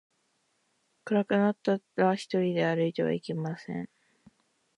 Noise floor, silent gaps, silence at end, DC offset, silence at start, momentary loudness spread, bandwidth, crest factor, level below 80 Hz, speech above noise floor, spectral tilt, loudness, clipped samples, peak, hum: -74 dBFS; none; 0.9 s; under 0.1%; 1.05 s; 12 LU; 10.5 kHz; 18 dB; -76 dBFS; 46 dB; -7 dB/octave; -29 LUFS; under 0.1%; -12 dBFS; none